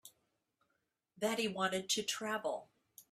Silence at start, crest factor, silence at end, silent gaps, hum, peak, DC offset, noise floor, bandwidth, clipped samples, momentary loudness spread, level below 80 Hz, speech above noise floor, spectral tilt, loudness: 0.05 s; 20 dB; 0.1 s; none; none; -20 dBFS; under 0.1%; -84 dBFS; 15.5 kHz; under 0.1%; 6 LU; -82 dBFS; 47 dB; -2.5 dB/octave; -37 LUFS